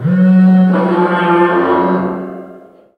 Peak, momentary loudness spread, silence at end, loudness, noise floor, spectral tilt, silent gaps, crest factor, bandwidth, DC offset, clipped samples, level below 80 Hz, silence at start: 0 dBFS; 15 LU; 0.4 s; -11 LUFS; -38 dBFS; -10 dB/octave; none; 12 dB; 4.5 kHz; under 0.1%; under 0.1%; -58 dBFS; 0 s